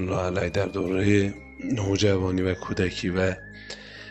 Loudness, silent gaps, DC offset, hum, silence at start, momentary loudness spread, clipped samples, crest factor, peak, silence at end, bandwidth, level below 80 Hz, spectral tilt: -25 LUFS; none; under 0.1%; none; 0 s; 15 LU; under 0.1%; 18 dB; -6 dBFS; 0 s; 8.4 kHz; -48 dBFS; -6 dB/octave